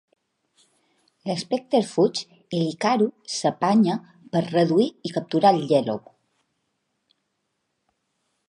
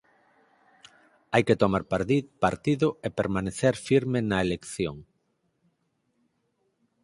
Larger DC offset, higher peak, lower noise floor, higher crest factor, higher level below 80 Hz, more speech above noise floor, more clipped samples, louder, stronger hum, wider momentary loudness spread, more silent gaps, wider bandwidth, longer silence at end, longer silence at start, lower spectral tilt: neither; about the same, -4 dBFS vs -6 dBFS; about the same, -76 dBFS vs -74 dBFS; about the same, 20 dB vs 22 dB; second, -74 dBFS vs -54 dBFS; first, 54 dB vs 49 dB; neither; first, -23 LUFS vs -26 LUFS; neither; first, 11 LU vs 8 LU; neither; about the same, 11.5 kHz vs 11.5 kHz; first, 2.5 s vs 2 s; about the same, 1.25 s vs 1.3 s; about the same, -6 dB/octave vs -6 dB/octave